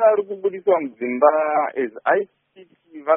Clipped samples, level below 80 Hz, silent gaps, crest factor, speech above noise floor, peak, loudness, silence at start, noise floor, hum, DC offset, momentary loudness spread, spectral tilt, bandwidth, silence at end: under 0.1%; -72 dBFS; none; 18 dB; 31 dB; -2 dBFS; -20 LUFS; 0 s; -51 dBFS; none; under 0.1%; 9 LU; 1.5 dB/octave; 3.7 kHz; 0 s